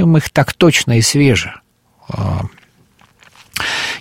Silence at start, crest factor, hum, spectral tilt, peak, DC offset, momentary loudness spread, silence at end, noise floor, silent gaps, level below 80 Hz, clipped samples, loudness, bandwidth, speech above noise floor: 0 s; 16 dB; none; -4.5 dB/octave; 0 dBFS; under 0.1%; 16 LU; 0 s; -51 dBFS; none; -42 dBFS; under 0.1%; -14 LUFS; 16.5 kHz; 38 dB